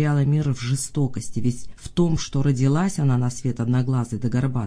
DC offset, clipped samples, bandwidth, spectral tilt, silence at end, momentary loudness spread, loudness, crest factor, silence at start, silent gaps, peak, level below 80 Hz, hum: under 0.1%; under 0.1%; 10.5 kHz; -6.5 dB/octave; 0 s; 6 LU; -23 LUFS; 14 dB; 0 s; none; -8 dBFS; -44 dBFS; none